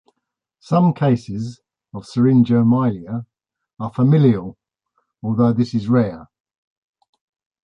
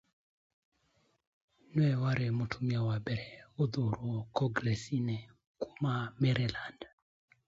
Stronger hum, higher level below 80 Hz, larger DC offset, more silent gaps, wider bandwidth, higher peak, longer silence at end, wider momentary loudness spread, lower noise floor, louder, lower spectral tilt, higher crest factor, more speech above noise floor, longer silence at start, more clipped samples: neither; first, -54 dBFS vs -62 dBFS; neither; second, none vs 5.47-5.55 s; about the same, 7.6 kHz vs 7.8 kHz; first, -4 dBFS vs -16 dBFS; first, 1.4 s vs 0.6 s; first, 17 LU vs 13 LU; first, -78 dBFS vs -74 dBFS; first, -18 LUFS vs -34 LUFS; first, -9.5 dB/octave vs -7 dB/octave; about the same, 16 dB vs 20 dB; first, 62 dB vs 41 dB; second, 0.7 s vs 1.7 s; neither